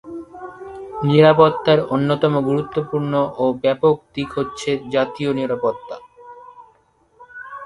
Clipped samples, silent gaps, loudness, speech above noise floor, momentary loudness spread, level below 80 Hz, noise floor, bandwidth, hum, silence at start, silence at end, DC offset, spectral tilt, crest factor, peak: under 0.1%; none; -18 LUFS; 40 dB; 21 LU; -54 dBFS; -58 dBFS; 11 kHz; none; 0.05 s; 0 s; under 0.1%; -7 dB/octave; 20 dB; 0 dBFS